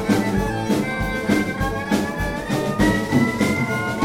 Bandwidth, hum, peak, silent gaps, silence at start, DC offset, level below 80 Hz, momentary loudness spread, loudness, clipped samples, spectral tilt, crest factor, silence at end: 17 kHz; none; -4 dBFS; none; 0 s; under 0.1%; -36 dBFS; 5 LU; -21 LUFS; under 0.1%; -5.5 dB/octave; 16 dB; 0 s